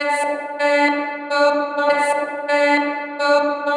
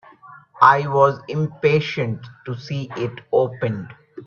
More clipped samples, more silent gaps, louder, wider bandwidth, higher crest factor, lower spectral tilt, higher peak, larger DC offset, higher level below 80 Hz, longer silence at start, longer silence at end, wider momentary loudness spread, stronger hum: neither; neither; about the same, -18 LUFS vs -20 LUFS; first, 10.5 kHz vs 7 kHz; about the same, 16 dB vs 20 dB; second, -2 dB/octave vs -7 dB/octave; second, -4 dBFS vs 0 dBFS; neither; second, -88 dBFS vs -62 dBFS; second, 0 s vs 0.25 s; about the same, 0 s vs 0 s; second, 6 LU vs 17 LU; neither